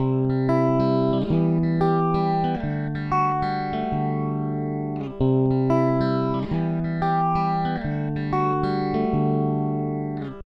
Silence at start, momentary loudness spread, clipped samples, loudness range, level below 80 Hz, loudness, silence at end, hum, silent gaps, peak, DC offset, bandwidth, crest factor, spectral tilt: 0 s; 6 LU; under 0.1%; 2 LU; -44 dBFS; -23 LUFS; 0.05 s; none; none; -8 dBFS; under 0.1%; 6 kHz; 14 dB; -10 dB/octave